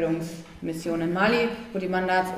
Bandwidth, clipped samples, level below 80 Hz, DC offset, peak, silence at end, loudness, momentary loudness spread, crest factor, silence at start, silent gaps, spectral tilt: 15.5 kHz; under 0.1%; -54 dBFS; under 0.1%; -10 dBFS; 0 s; -26 LUFS; 12 LU; 16 dB; 0 s; none; -6 dB/octave